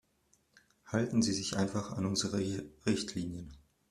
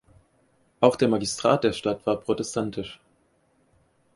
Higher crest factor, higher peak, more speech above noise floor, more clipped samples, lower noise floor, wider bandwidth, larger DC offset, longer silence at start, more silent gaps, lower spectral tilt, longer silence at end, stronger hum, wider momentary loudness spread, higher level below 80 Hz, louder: about the same, 20 dB vs 24 dB; second, -16 dBFS vs -2 dBFS; about the same, 39 dB vs 42 dB; neither; first, -73 dBFS vs -66 dBFS; first, 13.5 kHz vs 11.5 kHz; neither; about the same, 0.85 s vs 0.8 s; neither; about the same, -4.5 dB/octave vs -5 dB/octave; second, 0.3 s vs 1.2 s; neither; about the same, 10 LU vs 10 LU; about the same, -62 dBFS vs -58 dBFS; second, -34 LUFS vs -24 LUFS